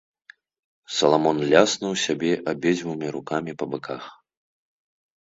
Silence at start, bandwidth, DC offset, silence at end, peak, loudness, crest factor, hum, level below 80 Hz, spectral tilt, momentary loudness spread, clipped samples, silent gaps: 0.9 s; 8 kHz; under 0.1%; 1.1 s; 0 dBFS; -23 LUFS; 24 dB; none; -66 dBFS; -4 dB/octave; 13 LU; under 0.1%; none